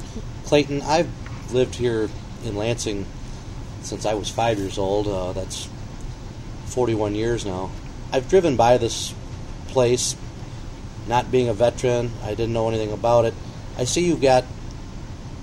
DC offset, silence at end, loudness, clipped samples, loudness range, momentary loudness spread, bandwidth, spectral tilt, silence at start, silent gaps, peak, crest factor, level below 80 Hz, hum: under 0.1%; 0 s; -22 LUFS; under 0.1%; 5 LU; 18 LU; 15 kHz; -5 dB/octave; 0 s; none; -2 dBFS; 20 dB; -36 dBFS; none